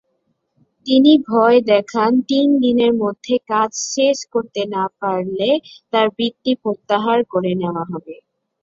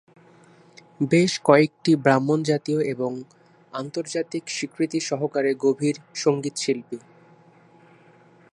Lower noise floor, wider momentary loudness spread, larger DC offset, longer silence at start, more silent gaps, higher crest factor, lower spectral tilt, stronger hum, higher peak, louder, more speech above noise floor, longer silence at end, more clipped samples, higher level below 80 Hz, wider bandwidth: first, -68 dBFS vs -54 dBFS; second, 9 LU vs 12 LU; neither; second, 0.85 s vs 1 s; neither; second, 16 dB vs 22 dB; about the same, -4.5 dB/octave vs -5.5 dB/octave; second, none vs 60 Hz at -60 dBFS; about the same, -2 dBFS vs -2 dBFS; first, -17 LUFS vs -23 LUFS; first, 52 dB vs 31 dB; second, 0.5 s vs 1.55 s; neither; first, -62 dBFS vs -70 dBFS; second, 7.8 kHz vs 11.5 kHz